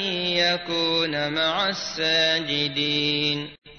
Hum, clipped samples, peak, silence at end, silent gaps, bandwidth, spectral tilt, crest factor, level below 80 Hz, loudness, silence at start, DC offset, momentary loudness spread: none; under 0.1%; -10 dBFS; 0 s; 3.58-3.62 s; 6.6 kHz; -3.5 dB/octave; 14 dB; -60 dBFS; -22 LUFS; 0 s; 0.1%; 5 LU